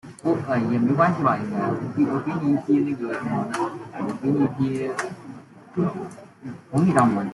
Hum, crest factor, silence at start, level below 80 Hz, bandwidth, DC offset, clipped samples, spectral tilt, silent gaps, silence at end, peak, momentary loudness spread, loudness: none; 18 dB; 0.05 s; -62 dBFS; 12 kHz; under 0.1%; under 0.1%; -7.5 dB/octave; none; 0 s; -6 dBFS; 16 LU; -23 LUFS